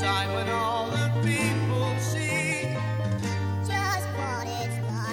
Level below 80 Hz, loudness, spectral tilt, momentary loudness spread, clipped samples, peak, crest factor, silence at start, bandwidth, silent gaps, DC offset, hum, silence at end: -58 dBFS; -27 LUFS; -5 dB/octave; 5 LU; under 0.1%; -12 dBFS; 14 dB; 0 s; 17 kHz; none; under 0.1%; none; 0 s